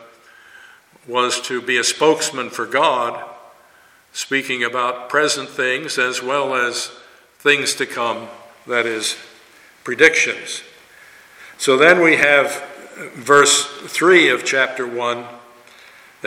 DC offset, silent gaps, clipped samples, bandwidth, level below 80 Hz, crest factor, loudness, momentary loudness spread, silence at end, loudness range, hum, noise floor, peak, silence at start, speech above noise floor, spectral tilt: under 0.1%; none; under 0.1%; 16.5 kHz; -66 dBFS; 18 dB; -16 LUFS; 18 LU; 0 s; 6 LU; none; -51 dBFS; 0 dBFS; 1.1 s; 34 dB; -2 dB/octave